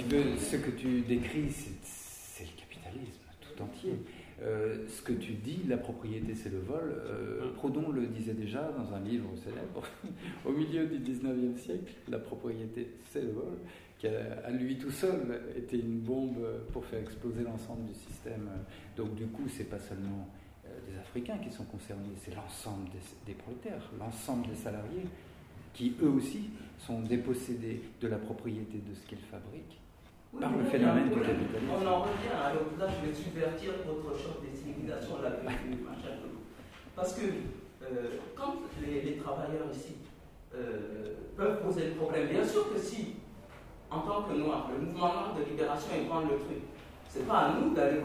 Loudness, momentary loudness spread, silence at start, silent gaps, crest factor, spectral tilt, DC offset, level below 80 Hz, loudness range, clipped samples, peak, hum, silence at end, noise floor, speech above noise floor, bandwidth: -36 LUFS; 16 LU; 0 s; none; 22 dB; -6 dB/octave; under 0.1%; -56 dBFS; 9 LU; under 0.1%; -14 dBFS; none; 0 s; -57 dBFS; 21 dB; 16 kHz